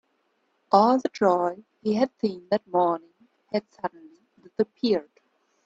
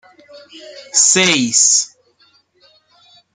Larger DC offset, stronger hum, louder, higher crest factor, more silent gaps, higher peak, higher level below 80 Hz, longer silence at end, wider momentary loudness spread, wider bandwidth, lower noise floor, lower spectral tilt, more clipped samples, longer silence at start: neither; neither; second, -25 LUFS vs -11 LUFS; about the same, 22 dB vs 18 dB; neither; second, -4 dBFS vs 0 dBFS; second, -72 dBFS vs -66 dBFS; second, 0.65 s vs 1.5 s; first, 13 LU vs 7 LU; second, 7.8 kHz vs 11 kHz; first, -71 dBFS vs -55 dBFS; first, -6.5 dB/octave vs -0.5 dB/octave; neither; first, 0.7 s vs 0.35 s